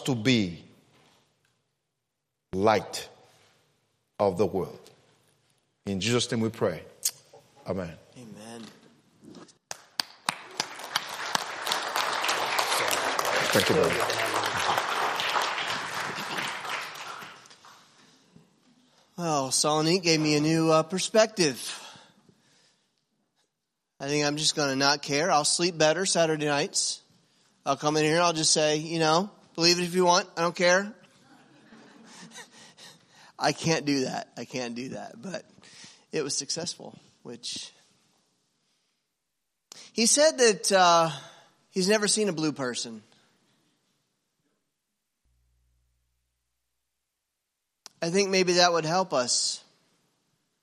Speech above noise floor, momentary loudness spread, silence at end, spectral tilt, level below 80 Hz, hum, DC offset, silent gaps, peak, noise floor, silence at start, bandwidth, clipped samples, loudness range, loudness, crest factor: 57 dB; 17 LU; 1.05 s; -3 dB/octave; -72 dBFS; none; under 0.1%; none; -4 dBFS; -83 dBFS; 0 s; 15 kHz; under 0.1%; 11 LU; -26 LUFS; 24 dB